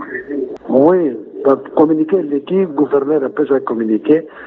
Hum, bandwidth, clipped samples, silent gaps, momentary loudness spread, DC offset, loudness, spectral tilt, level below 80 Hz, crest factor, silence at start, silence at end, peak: none; 4.1 kHz; under 0.1%; none; 8 LU; under 0.1%; -15 LUFS; -7 dB/octave; -60 dBFS; 14 dB; 0 s; 0 s; 0 dBFS